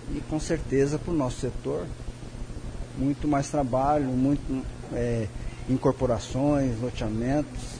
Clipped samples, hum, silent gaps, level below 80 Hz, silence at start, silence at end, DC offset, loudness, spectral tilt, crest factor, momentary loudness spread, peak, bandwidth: under 0.1%; none; none; -38 dBFS; 0 s; 0 s; under 0.1%; -27 LUFS; -7 dB/octave; 16 dB; 14 LU; -12 dBFS; 10.5 kHz